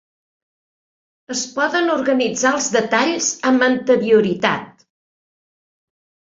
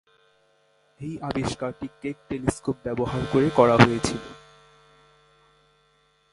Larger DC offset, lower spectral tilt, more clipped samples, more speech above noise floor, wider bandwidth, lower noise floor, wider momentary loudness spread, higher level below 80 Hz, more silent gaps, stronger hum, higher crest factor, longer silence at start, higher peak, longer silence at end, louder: neither; second, -3 dB/octave vs -6 dB/octave; neither; first, over 73 dB vs 41 dB; second, 7.8 kHz vs 11.5 kHz; first, under -90 dBFS vs -64 dBFS; second, 7 LU vs 18 LU; second, -62 dBFS vs -50 dBFS; neither; neither; second, 20 dB vs 26 dB; first, 1.3 s vs 1 s; about the same, 0 dBFS vs 0 dBFS; second, 1.65 s vs 1.95 s; first, -17 LUFS vs -24 LUFS